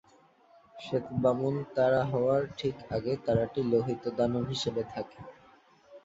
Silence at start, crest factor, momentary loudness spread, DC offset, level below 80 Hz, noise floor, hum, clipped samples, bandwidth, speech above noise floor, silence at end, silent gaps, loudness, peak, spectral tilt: 0.75 s; 18 dB; 12 LU; under 0.1%; -58 dBFS; -62 dBFS; none; under 0.1%; 8 kHz; 32 dB; 0.05 s; none; -30 LUFS; -14 dBFS; -7 dB/octave